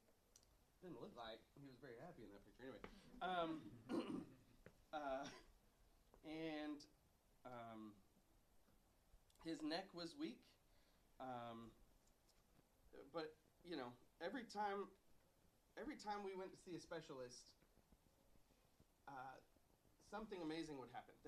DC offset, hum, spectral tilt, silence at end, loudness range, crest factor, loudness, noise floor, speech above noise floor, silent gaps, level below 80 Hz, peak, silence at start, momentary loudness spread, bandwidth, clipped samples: under 0.1%; none; -5 dB/octave; 0 s; 7 LU; 22 dB; -53 LUFS; -78 dBFS; 25 dB; none; -78 dBFS; -32 dBFS; 0.1 s; 16 LU; 13.5 kHz; under 0.1%